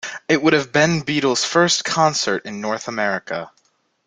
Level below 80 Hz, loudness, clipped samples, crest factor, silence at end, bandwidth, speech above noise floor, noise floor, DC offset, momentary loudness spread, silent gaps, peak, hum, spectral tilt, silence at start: -60 dBFS; -18 LUFS; under 0.1%; 18 dB; 0.6 s; 9.6 kHz; 45 dB; -63 dBFS; under 0.1%; 9 LU; none; -2 dBFS; none; -3.5 dB/octave; 0.05 s